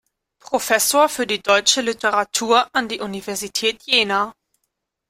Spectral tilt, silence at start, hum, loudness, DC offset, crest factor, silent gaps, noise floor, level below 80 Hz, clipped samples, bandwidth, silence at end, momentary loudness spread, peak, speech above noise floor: -1 dB/octave; 0.5 s; none; -18 LUFS; under 0.1%; 20 dB; none; -76 dBFS; -60 dBFS; under 0.1%; 16.5 kHz; 0.8 s; 11 LU; 0 dBFS; 57 dB